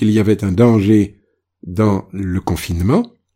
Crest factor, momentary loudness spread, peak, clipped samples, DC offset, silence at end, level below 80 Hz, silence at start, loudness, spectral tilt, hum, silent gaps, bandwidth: 14 dB; 9 LU; 0 dBFS; under 0.1%; under 0.1%; 0.25 s; -38 dBFS; 0 s; -16 LUFS; -7.5 dB/octave; none; none; 16 kHz